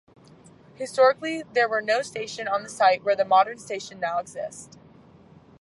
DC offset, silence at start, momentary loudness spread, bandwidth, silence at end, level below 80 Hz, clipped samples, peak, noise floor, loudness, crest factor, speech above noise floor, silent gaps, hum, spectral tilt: under 0.1%; 0.8 s; 15 LU; 11.5 kHz; 0.95 s; -70 dBFS; under 0.1%; -6 dBFS; -52 dBFS; -24 LUFS; 18 dB; 28 dB; none; none; -3 dB/octave